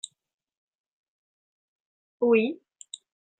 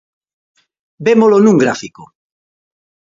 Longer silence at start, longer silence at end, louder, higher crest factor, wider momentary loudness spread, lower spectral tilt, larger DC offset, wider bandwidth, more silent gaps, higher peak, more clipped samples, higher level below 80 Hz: first, 2.2 s vs 1 s; second, 0.85 s vs 1.05 s; second, -25 LUFS vs -11 LUFS; first, 22 dB vs 14 dB; first, 21 LU vs 15 LU; second, -4.5 dB/octave vs -6.5 dB/octave; neither; first, 9.2 kHz vs 7.6 kHz; neither; second, -10 dBFS vs 0 dBFS; neither; second, -78 dBFS vs -60 dBFS